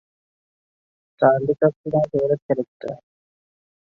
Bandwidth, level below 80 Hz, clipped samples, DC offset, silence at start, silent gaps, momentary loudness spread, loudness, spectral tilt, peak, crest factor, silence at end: 6.4 kHz; -62 dBFS; under 0.1%; under 0.1%; 1.2 s; 1.76-1.84 s, 2.42-2.49 s, 2.68-2.80 s; 16 LU; -21 LUFS; -10 dB/octave; -4 dBFS; 20 dB; 1 s